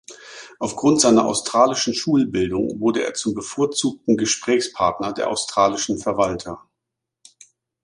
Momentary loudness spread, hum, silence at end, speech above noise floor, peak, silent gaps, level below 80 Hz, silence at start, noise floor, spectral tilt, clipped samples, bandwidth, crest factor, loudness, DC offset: 12 LU; none; 1.25 s; 63 dB; -2 dBFS; none; -54 dBFS; 0.1 s; -82 dBFS; -3.5 dB/octave; under 0.1%; 11.5 kHz; 20 dB; -20 LUFS; under 0.1%